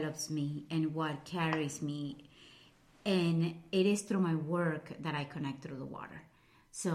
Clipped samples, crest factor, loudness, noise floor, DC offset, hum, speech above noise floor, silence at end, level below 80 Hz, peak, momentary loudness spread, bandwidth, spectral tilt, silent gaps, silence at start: under 0.1%; 18 dB; -35 LUFS; -62 dBFS; under 0.1%; none; 28 dB; 0 s; -72 dBFS; -18 dBFS; 14 LU; 14.5 kHz; -5.5 dB/octave; none; 0 s